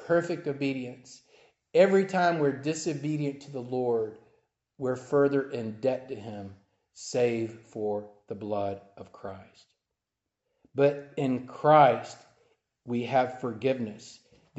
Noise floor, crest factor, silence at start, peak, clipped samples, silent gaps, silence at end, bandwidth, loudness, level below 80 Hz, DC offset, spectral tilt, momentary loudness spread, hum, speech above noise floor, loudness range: -87 dBFS; 22 dB; 0 s; -6 dBFS; under 0.1%; none; 0.45 s; 8.2 kHz; -28 LUFS; -74 dBFS; under 0.1%; -6 dB/octave; 20 LU; none; 59 dB; 7 LU